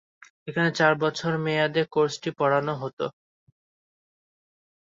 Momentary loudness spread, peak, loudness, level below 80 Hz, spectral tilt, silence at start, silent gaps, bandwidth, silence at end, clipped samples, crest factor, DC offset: 11 LU; -6 dBFS; -25 LUFS; -70 dBFS; -5.5 dB/octave; 0.45 s; 2.93-2.97 s; 7.8 kHz; 1.85 s; under 0.1%; 22 dB; under 0.1%